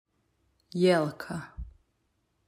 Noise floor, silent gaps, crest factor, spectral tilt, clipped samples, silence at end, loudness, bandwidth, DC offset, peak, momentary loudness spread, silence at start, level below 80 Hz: -75 dBFS; none; 20 dB; -6.5 dB/octave; under 0.1%; 0.75 s; -28 LUFS; 15 kHz; under 0.1%; -12 dBFS; 22 LU; 0.75 s; -52 dBFS